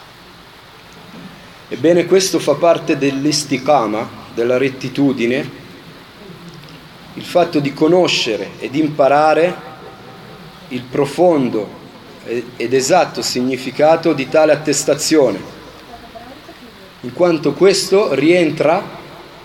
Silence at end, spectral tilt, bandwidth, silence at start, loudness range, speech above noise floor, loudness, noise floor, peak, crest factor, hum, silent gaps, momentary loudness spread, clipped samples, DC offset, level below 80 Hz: 0 s; -4.5 dB/octave; 17 kHz; 0 s; 4 LU; 26 dB; -15 LUFS; -40 dBFS; 0 dBFS; 16 dB; none; none; 23 LU; under 0.1%; under 0.1%; -54 dBFS